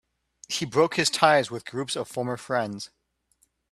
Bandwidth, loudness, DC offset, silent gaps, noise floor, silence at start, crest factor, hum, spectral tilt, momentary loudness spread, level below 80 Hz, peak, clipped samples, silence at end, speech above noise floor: 13.5 kHz; -25 LUFS; under 0.1%; none; -69 dBFS; 0.5 s; 24 dB; none; -3.5 dB/octave; 13 LU; -68 dBFS; -2 dBFS; under 0.1%; 0.85 s; 44 dB